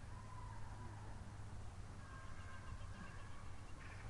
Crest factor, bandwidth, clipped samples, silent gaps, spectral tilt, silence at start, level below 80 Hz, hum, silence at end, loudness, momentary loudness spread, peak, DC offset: 12 dB; 11.5 kHz; under 0.1%; none; -5.5 dB/octave; 0 s; -56 dBFS; none; 0 s; -55 LUFS; 2 LU; -38 dBFS; under 0.1%